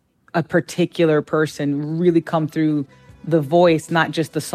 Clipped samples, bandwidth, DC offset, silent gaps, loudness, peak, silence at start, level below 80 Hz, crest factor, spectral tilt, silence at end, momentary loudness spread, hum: under 0.1%; 15.5 kHz; under 0.1%; none; -19 LUFS; -2 dBFS; 0.35 s; -60 dBFS; 18 dB; -6.5 dB/octave; 0 s; 9 LU; none